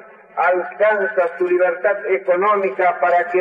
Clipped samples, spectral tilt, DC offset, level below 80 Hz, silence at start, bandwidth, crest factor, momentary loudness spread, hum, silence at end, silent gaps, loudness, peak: under 0.1%; -7 dB/octave; under 0.1%; -82 dBFS; 0.35 s; 5 kHz; 12 dB; 4 LU; none; 0 s; none; -18 LUFS; -6 dBFS